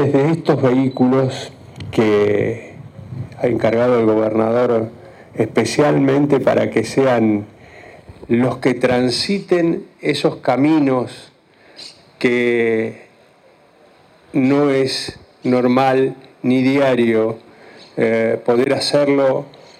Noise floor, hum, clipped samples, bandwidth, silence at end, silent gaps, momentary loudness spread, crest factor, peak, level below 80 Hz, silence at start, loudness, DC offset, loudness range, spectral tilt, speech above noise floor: -50 dBFS; none; under 0.1%; 13 kHz; 0.3 s; none; 15 LU; 14 dB; -2 dBFS; -54 dBFS; 0 s; -16 LUFS; under 0.1%; 3 LU; -6 dB/octave; 35 dB